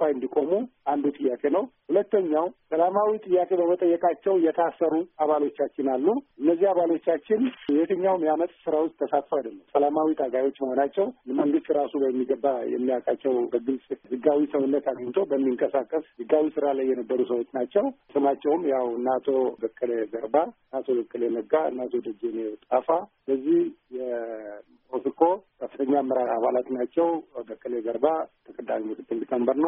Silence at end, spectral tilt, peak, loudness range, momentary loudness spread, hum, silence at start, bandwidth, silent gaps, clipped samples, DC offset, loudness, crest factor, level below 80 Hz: 0 s; -2.5 dB/octave; -6 dBFS; 3 LU; 8 LU; none; 0 s; 3.7 kHz; none; under 0.1%; under 0.1%; -26 LUFS; 18 dB; -74 dBFS